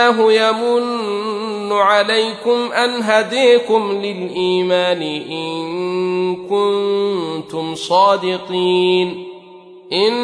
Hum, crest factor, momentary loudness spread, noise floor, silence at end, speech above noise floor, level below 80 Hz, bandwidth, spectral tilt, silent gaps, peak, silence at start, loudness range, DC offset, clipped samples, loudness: none; 14 dB; 10 LU; -40 dBFS; 0 s; 24 dB; -66 dBFS; 10.5 kHz; -4.5 dB/octave; none; -2 dBFS; 0 s; 3 LU; under 0.1%; under 0.1%; -16 LUFS